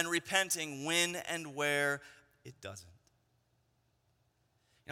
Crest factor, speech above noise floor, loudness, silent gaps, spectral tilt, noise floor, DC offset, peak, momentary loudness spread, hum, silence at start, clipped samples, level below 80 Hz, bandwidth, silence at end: 24 dB; 40 dB; -33 LUFS; none; -2 dB/octave; -76 dBFS; under 0.1%; -14 dBFS; 17 LU; none; 0 s; under 0.1%; -78 dBFS; 16.5 kHz; 0 s